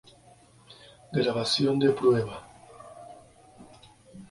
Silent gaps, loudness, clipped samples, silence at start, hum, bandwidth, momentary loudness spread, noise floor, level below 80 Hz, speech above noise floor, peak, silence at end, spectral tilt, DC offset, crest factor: none; -25 LUFS; under 0.1%; 0.7 s; none; 11.5 kHz; 25 LU; -56 dBFS; -62 dBFS; 32 dB; -10 dBFS; 0.05 s; -5.5 dB/octave; under 0.1%; 18 dB